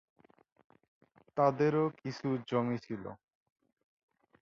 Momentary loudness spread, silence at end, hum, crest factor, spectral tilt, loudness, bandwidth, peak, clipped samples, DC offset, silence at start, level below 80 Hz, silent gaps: 15 LU; 1.25 s; none; 22 dB; -8 dB/octave; -33 LUFS; 7.2 kHz; -14 dBFS; under 0.1%; under 0.1%; 1.35 s; -74 dBFS; none